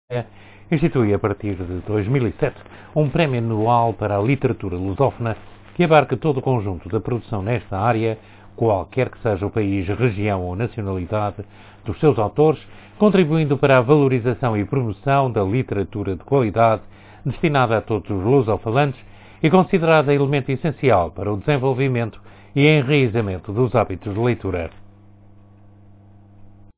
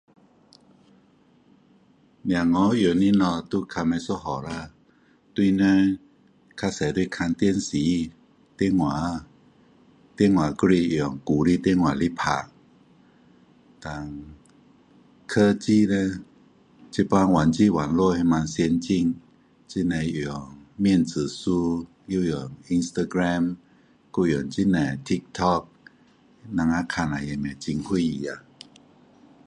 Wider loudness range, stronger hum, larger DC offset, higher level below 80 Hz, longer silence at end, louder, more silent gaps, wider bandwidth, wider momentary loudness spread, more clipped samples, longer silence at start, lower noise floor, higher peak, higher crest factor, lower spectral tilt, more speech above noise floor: about the same, 4 LU vs 5 LU; neither; neither; first, -42 dBFS vs -48 dBFS; second, 0.3 s vs 1.1 s; first, -20 LUFS vs -24 LUFS; neither; second, 4 kHz vs 10.5 kHz; second, 11 LU vs 14 LU; neither; second, 0.1 s vs 2.25 s; second, -46 dBFS vs -59 dBFS; first, 0 dBFS vs -6 dBFS; about the same, 18 dB vs 18 dB; first, -11.5 dB/octave vs -6.5 dB/octave; second, 27 dB vs 36 dB